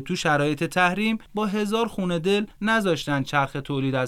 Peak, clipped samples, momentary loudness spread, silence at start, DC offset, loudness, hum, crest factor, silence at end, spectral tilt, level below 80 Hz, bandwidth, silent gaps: -6 dBFS; under 0.1%; 5 LU; 0 s; under 0.1%; -24 LUFS; none; 18 dB; 0 s; -5.5 dB/octave; -52 dBFS; 16 kHz; none